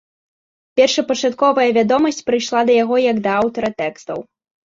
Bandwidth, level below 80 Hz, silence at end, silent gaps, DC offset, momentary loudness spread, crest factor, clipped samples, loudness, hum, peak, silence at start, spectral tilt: 7.8 kHz; -60 dBFS; 0.55 s; none; under 0.1%; 10 LU; 16 dB; under 0.1%; -16 LUFS; none; -2 dBFS; 0.75 s; -4 dB/octave